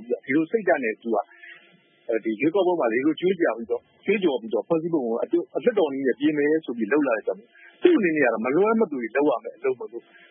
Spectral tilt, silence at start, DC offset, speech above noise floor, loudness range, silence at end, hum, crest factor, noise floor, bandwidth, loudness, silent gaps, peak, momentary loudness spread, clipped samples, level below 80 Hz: -10.5 dB/octave; 0 s; under 0.1%; 34 dB; 2 LU; 0.3 s; none; 20 dB; -57 dBFS; 3.6 kHz; -24 LUFS; none; -4 dBFS; 8 LU; under 0.1%; -78 dBFS